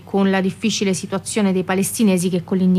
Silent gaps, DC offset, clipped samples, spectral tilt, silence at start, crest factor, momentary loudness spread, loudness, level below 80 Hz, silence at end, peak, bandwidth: none; under 0.1%; under 0.1%; -5 dB/octave; 0.05 s; 10 dB; 4 LU; -19 LUFS; -58 dBFS; 0 s; -8 dBFS; 14.5 kHz